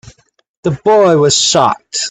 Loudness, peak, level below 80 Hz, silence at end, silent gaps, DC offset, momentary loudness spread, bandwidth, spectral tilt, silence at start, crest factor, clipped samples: -11 LUFS; 0 dBFS; -50 dBFS; 0 s; none; under 0.1%; 10 LU; 9.4 kHz; -3.5 dB/octave; 0.65 s; 12 dB; under 0.1%